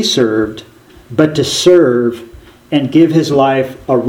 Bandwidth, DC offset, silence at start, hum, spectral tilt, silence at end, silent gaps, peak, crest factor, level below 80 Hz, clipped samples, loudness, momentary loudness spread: 16 kHz; under 0.1%; 0 s; none; -5 dB/octave; 0 s; none; 0 dBFS; 12 dB; -46 dBFS; 0.2%; -12 LUFS; 11 LU